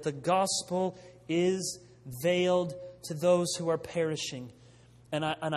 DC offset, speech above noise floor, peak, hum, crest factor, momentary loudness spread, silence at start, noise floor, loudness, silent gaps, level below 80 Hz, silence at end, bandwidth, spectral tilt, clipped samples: under 0.1%; 27 dB; -14 dBFS; none; 18 dB; 16 LU; 0 s; -57 dBFS; -30 LUFS; none; -66 dBFS; 0 s; 14 kHz; -4.5 dB/octave; under 0.1%